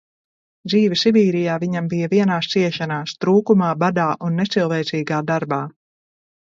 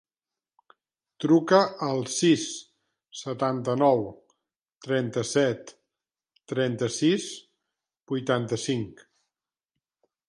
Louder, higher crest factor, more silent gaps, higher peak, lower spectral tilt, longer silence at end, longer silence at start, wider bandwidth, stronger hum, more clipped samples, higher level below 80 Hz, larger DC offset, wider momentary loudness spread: first, -19 LUFS vs -25 LUFS; second, 16 dB vs 22 dB; second, none vs 4.61-4.65 s; first, -2 dBFS vs -6 dBFS; first, -6.5 dB/octave vs -5 dB/octave; second, 0.75 s vs 1.35 s; second, 0.65 s vs 1.2 s; second, 7.6 kHz vs 11.5 kHz; neither; neither; about the same, -64 dBFS vs -68 dBFS; neither; second, 8 LU vs 16 LU